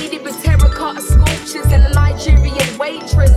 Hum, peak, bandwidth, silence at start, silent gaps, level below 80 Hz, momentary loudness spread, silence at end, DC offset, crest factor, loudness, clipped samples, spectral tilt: none; 0 dBFS; 14 kHz; 0 s; none; -14 dBFS; 8 LU; 0 s; under 0.1%; 12 dB; -14 LUFS; under 0.1%; -5.5 dB/octave